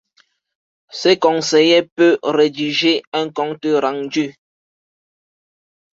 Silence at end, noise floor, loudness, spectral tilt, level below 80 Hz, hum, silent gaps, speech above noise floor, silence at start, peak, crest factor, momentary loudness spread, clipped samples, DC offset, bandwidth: 1.6 s; -59 dBFS; -16 LUFS; -4 dB/octave; -66 dBFS; none; 1.92-1.96 s, 3.07-3.12 s; 43 dB; 0.95 s; -2 dBFS; 16 dB; 9 LU; under 0.1%; under 0.1%; 7.8 kHz